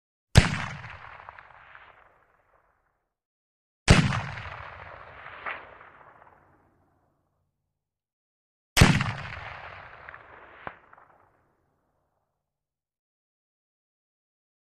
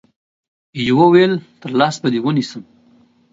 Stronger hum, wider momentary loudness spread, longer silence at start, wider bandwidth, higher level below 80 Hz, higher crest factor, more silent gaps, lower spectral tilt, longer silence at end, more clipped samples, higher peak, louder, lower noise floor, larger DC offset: neither; first, 25 LU vs 17 LU; second, 0.35 s vs 0.75 s; first, 11.5 kHz vs 7.8 kHz; first, -40 dBFS vs -58 dBFS; first, 28 dB vs 18 dB; first, 3.25-3.86 s, 8.13-8.76 s vs none; second, -5 dB/octave vs -6.5 dB/octave; first, 4.05 s vs 0.7 s; neither; about the same, -2 dBFS vs 0 dBFS; second, -25 LUFS vs -15 LUFS; first, under -90 dBFS vs -52 dBFS; neither